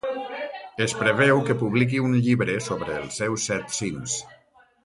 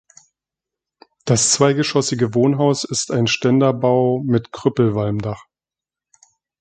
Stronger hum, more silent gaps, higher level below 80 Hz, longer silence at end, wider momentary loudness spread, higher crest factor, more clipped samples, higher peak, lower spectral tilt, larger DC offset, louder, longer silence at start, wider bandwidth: neither; neither; about the same, -56 dBFS vs -54 dBFS; second, 0.5 s vs 1.2 s; first, 11 LU vs 7 LU; about the same, 18 dB vs 18 dB; neither; second, -6 dBFS vs 0 dBFS; about the same, -5 dB/octave vs -4.5 dB/octave; neither; second, -24 LUFS vs -17 LUFS; second, 0.05 s vs 1.25 s; first, 11.5 kHz vs 9.4 kHz